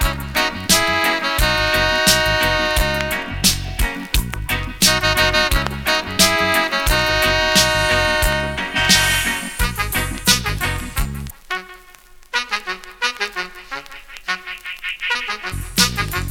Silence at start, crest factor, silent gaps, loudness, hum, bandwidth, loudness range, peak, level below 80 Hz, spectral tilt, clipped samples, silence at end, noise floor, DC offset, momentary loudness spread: 0 s; 18 dB; none; -17 LUFS; none; 19.5 kHz; 9 LU; 0 dBFS; -28 dBFS; -2 dB/octave; under 0.1%; 0 s; -44 dBFS; under 0.1%; 13 LU